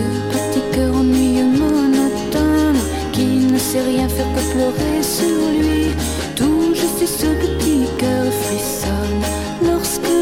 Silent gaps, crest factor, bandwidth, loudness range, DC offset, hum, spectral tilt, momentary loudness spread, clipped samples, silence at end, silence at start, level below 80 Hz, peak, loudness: none; 12 dB; 16.5 kHz; 2 LU; under 0.1%; none; -5 dB/octave; 5 LU; under 0.1%; 0 s; 0 s; -30 dBFS; -4 dBFS; -17 LUFS